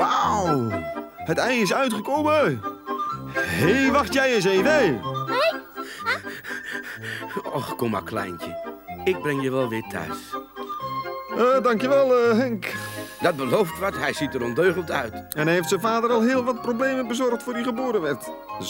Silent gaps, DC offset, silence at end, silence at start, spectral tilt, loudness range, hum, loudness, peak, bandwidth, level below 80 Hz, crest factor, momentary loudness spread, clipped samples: none; under 0.1%; 0 s; 0 s; -5 dB/octave; 7 LU; none; -23 LUFS; -6 dBFS; 18 kHz; -56 dBFS; 18 dB; 13 LU; under 0.1%